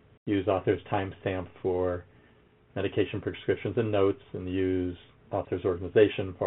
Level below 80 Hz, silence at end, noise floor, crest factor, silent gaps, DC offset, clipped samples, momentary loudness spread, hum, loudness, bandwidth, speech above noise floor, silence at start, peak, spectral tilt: -60 dBFS; 0 s; -60 dBFS; 20 dB; none; under 0.1%; under 0.1%; 10 LU; none; -29 LUFS; 4 kHz; 32 dB; 0.25 s; -8 dBFS; -6 dB/octave